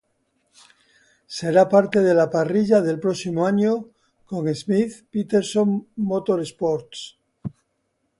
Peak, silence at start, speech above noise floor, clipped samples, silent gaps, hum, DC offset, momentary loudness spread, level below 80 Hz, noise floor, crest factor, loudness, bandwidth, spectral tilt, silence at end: -4 dBFS; 1.3 s; 52 dB; under 0.1%; none; none; under 0.1%; 19 LU; -64 dBFS; -72 dBFS; 18 dB; -21 LUFS; 11.5 kHz; -6.5 dB/octave; 0.7 s